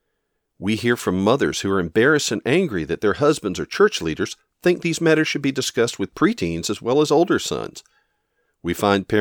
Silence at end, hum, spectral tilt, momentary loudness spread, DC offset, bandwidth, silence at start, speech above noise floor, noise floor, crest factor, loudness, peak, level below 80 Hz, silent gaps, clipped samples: 0 s; none; -4.5 dB/octave; 9 LU; under 0.1%; 20 kHz; 0.6 s; 54 dB; -74 dBFS; 18 dB; -20 LUFS; -2 dBFS; -52 dBFS; none; under 0.1%